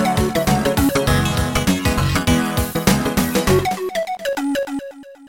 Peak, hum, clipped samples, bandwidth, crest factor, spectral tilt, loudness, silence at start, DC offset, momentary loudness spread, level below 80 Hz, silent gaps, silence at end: -2 dBFS; none; under 0.1%; 17 kHz; 18 dB; -5 dB/octave; -18 LUFS; 0 s; under 0.1%; 6 LU; -30 dBFS; none; 0 s